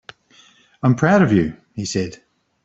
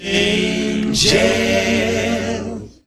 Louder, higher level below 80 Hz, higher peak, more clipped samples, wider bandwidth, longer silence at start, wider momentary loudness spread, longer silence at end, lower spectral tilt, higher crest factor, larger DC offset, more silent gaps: about the same, -18 LUFS vs -16 LUFS; second, -52 dBFS vs -38 dBFS; about the same, -2 dBFS vs 0 dBFS; neither; second, 8 kHz vs 13.5 kHz; first, 0.85 s vs 0 s; first, 13 LU vs 10 LU; first, 0.5 s vs 0.15 s; first, -6.5 dB/octave vs -3.5 dB/octave; about the same, 18 dB vs 18 dB; neither; neither